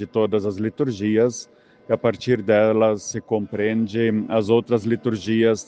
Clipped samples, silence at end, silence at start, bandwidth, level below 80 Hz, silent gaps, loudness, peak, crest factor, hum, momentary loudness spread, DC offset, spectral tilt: under 0.1%; 0.05 s; 0 s; 9.2 kHz; -62 dBFS; none; -21 LUFS; -4 dBFS; 16 dB; none; 7 LU; under 0.1%; -6 dB/octave